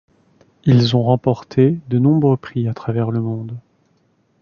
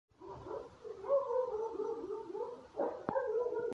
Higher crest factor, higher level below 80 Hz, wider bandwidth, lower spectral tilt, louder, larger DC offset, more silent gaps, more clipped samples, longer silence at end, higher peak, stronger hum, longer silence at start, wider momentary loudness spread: about the same, 16 dB vs 20 dB; first, -52 dBFS vs -70 dBFS; second, 7 kHz vs 7.8 kHz; first, -8.5 dB/octave vs -7 dB/octave; first, -17 LUFS vs -38 LUFS; neither; neither; neither; first, 0.85 s vs 0 s; first, 0 dBFS vs -18 dBFS; neither; first, 0.65 s vs 0.2 s; about the same, 10 LU vs 12 LU